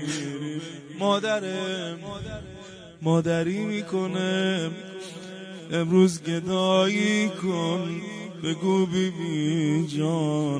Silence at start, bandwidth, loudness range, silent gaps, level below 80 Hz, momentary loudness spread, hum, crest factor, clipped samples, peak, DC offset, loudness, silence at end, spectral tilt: 0 s; 10.5 kHz; 4 LU; none; -58 dBFS; 17 LU; none; 18 dB; under 0.1%; -8 dBFS; under 0.1%; -25 LUFS; 0 s; -5.5 dB/octave